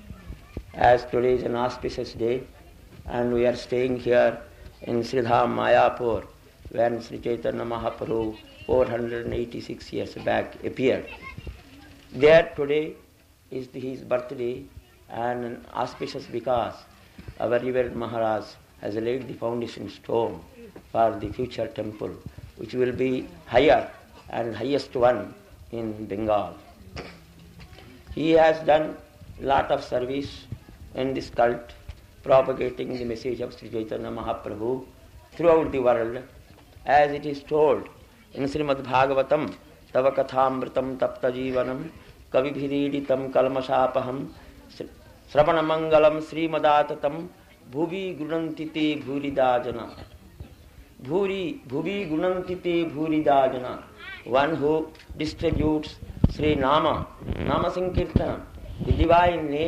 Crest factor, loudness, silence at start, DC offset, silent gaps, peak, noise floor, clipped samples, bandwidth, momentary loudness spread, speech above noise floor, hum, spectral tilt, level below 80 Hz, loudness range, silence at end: 22 dB; -25 LUFS; 0.05 s; under 0.1%; none; -4 dBFS; -49 dBFS; under 0.1%; 14 kHz; 18 LU; 25 dB; none; -7 dB/octave; -44 dBFS; 5 LU; 0 s